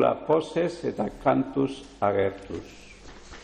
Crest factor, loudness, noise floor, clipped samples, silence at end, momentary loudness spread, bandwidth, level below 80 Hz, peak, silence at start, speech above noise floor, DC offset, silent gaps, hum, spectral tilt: 18 dB; -26 LUFS; -45 dBFS; under 0.1%; 0 s; 21 LU; 10 kHz; -52 dBFS; -10 dBFS; 0 s; 19 dB; under 0.1%; none; none; -7 dB/octave